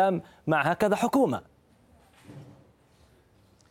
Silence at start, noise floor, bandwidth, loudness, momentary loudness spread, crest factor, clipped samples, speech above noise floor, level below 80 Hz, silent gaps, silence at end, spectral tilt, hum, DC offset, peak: 0 s; -61 dBFS; 16.5 kHz; -26 LUFS; 25 LU; 20 dB; under 0.1%; 36 dB; -64 dBFS; none; 1.25 s; -6 dB/octave; none; under 0.1%; -10 dBFS